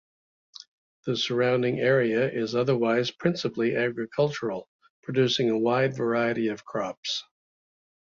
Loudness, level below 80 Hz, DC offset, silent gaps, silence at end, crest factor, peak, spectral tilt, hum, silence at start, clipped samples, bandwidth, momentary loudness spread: -26 LUFS; -68 dBFS; under 0.1%; 4.68-4.79 s, 4.90-5.03 s, 6.97-7.03 s; 0.95 s; 18 dB; -8 dBFS; -5.5 dB/octave; none; 1.05 s; under 0.1%; 7.6 kHz; 10 LU